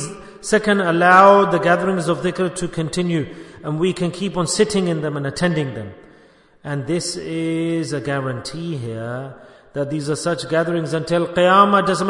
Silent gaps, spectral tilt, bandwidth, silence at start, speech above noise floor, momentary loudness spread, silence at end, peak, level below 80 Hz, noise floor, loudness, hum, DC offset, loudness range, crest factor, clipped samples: none; -5 dB/octave; 11 kHz; 0 s; 32 dB; 16 LU; 0 s; 0 dBFS; -52 dBFS; -51 dBFS; -18 LUFS; none; under 0.1%; 9 LU; 18 dB; under 0.1%